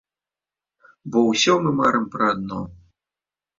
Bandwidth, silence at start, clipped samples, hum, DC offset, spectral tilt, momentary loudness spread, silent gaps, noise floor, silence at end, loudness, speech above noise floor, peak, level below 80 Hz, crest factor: 7.8 kHz; 1.05 s; under 0.1%; none; under 0.1%; -4.5 dB/octave; 16 LU; none; under -90 dBFS; 0.85 s; -20 LUFS; over 70 dB; -4 dBFS; -56 dBFS; 18 dB